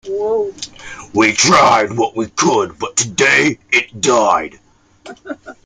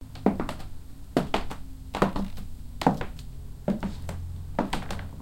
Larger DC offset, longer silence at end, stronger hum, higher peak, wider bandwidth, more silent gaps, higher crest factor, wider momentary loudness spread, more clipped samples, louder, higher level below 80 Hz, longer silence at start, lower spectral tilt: neither; first, 0.15 s vs 0 s; neither; first, 0 dBFS vs -6 dBFS; second, 11 kHz vs 17 kHz; neither; second, 16 dB vs 24 dB; first, 20 LU vs 16 LU; neither; first, -14 LUFS vs -31 LUFS; second, -52 dBFS vs -40 dBFS; about the same, 0.05 s vs 0 s; second, -2.5 dB/octave vs -6.5 dB/octave